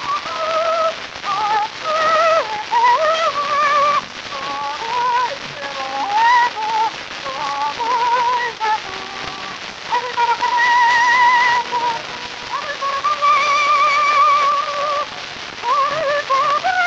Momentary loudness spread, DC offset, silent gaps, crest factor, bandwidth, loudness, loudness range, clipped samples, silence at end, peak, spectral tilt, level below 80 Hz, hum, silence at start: 13 LU; under 0.1%; none; 14 dB; 8.4 kHz; -17 LUFS; 3 LU; under 0.1%; 0 s; -2 dBFS; -1.5 dB/octave; -58 dBFS; none; 0 s